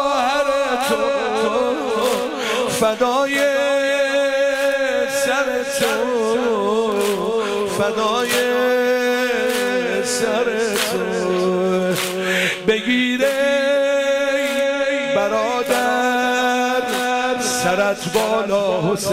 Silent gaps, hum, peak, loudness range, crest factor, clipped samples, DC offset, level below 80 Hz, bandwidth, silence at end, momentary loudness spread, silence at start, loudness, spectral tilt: none; none; -6 dBFS; 1 LU; 12 dB; under 0.1%; under 0.1%; -54 dBFS; 16 kHz; 0 s; 3 LU; 0 s; -18 LUFS; -3.5 dB/octave